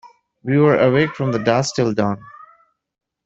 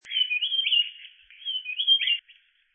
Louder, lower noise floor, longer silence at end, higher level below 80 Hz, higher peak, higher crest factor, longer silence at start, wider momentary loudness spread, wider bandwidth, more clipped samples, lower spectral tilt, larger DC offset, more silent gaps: first, -17 LUFS vs -23 LUFS; second, -55 dBFS vs -59 dBFS; first, 0.85 s vs 0.55 s; first, -54 dBFS vs -84 dBFS; first, -2 dBFS vs -12 dBFS; about the same, 16 dB vs 16 dB; about the same, 0.05 s vs 0.05 s; about the same, 9 LU vs 10 LU; about the same, 8 kHz vs 8.4 kHz; neither; first, -6 dB/octave vs 5 dB/octave; neither; neither